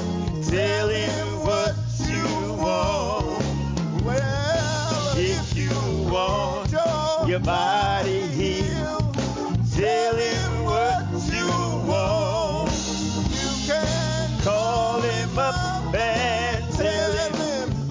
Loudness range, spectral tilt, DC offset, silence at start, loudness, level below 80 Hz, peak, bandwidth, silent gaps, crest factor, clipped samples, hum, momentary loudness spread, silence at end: 1 LU; -5 dB/octave; under 0.1%; 0 s; -23 LUFS; -36 dBFS; -8 dBFS; 7.6 kHz; none; 14 dB; under 0.1%; none; 4 LU; 0 s